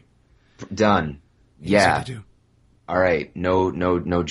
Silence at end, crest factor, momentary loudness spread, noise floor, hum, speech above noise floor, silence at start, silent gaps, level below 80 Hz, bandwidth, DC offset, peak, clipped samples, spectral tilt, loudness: 0 s; 20 dB; 18 LU; -59 dBFS; none; 38 dB; 0.6 s; none; -48 dBFS; 11.5 kHz; under 0.1%; -2 dBFS; under 0.1%; -6 dB/octave; -21 LUFS